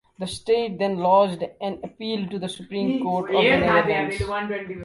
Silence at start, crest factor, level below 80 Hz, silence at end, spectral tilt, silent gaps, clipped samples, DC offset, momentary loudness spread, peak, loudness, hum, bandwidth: 0.2 s; 18 dB; -48 dBFS; 0 s; -5.5 dB/octave; none; under 0.1%; under 0.1%; 13 LU; -4 dBFS; -23 LUFS; none; 11.5 kHz